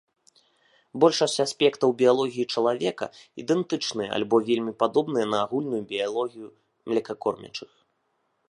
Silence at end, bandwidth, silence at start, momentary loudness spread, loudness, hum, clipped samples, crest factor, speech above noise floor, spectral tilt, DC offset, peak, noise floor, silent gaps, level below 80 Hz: 0.85 s; 11.5 kHz; 0.95 s; 14 LU; -25 LUFS; none; under 0.1%; 20 dB; 48 dB; -4.5 dB/octave; under 0.1%; -6 dBFS; -73 dBFS; none; -72 dBFS